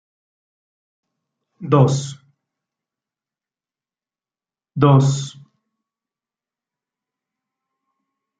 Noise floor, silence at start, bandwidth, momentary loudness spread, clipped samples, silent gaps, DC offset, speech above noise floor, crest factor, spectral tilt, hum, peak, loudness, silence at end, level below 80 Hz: under -90 dBFS; 1.6 s; 9 kHz; 19 LU; under 0.1%; none; under 0.1%; over 75 dB; 22 dB; -7 dB/octave; none; -2 dBFS; -17 LUFS; 3.1 s; -60 dBFS